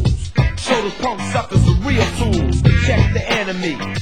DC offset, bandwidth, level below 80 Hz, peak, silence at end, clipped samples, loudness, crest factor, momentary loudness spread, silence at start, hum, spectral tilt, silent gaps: 2%; 16 kHz; -22 dBFS; 0 dBFS; 0 s; under 0.1%; -17 LUFS; 16 dB; 7 LU; 0 s; none; -6 dB/octave; none